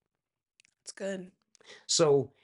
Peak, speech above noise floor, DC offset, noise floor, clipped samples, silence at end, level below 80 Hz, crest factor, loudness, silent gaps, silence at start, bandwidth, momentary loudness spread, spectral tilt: -14 dBFS; 59 dB; under 0.1%; -88 dBFS; under 0.1%; 0.15 s; -80 dBFS; 18 dB; -28 LUFS; none; 0.85 s; 11.5 kHz; 24 LU; -3.5 dB/octave